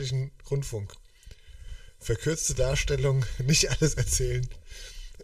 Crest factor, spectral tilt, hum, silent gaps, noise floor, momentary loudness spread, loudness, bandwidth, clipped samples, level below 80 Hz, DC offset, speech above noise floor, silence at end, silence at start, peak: 20 dB; -4 dB/octave; none; none; -49 dBFS; 21 LU; -27 LUFS; 15.5 kHz; under 0.1%; -36 dBFS; under 0.1%; 22 dB; 0 s; 0 s; -10 dBFS